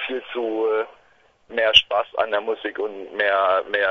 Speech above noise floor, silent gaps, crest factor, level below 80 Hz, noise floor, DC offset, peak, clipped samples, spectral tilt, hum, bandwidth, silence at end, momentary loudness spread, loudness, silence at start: 36 dB; none; 22 dB; -56 dBFS; -57 dBFS; under 0.1%; 0 dBFS; under 0.1%; -2.5 dB/octave; none; 6.8 kHz; 0 s; 13 LU; -21 LUFS; 0 s